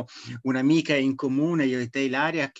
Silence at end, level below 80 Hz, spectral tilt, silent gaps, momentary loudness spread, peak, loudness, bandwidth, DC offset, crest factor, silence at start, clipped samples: 0.1 s; -70 dBFS; -6 dB/octave; none; 7 LU; -10 dBFS; -24 LUFS; 8 kHz; under 0.1%; 14 dB; 0 s; under 0.1%